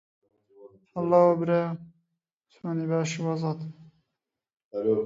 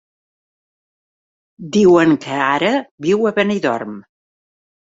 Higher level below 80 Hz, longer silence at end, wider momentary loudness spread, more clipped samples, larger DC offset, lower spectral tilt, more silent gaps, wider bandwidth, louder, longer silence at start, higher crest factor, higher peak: second, -72 dBFS vs -58 dBFS; second, 0 s vs 0.9 s; about the same, 18 LU vs 16 LU; neither; neither; about the same, -7 dB/octave vs -6 dB/octave; about the same, 2.33-2.37 s, 4.64-4.71 s vs 2.91-2.98 s; about the same, 7.8 kHz vs 7.8 kHz; second, -26 LUFS vs -16 LUFS; second, 0.6 s vs 1.6 s; about the same, 20 dB vs 16 dB; second, -8 dBFS vs -2 dBFS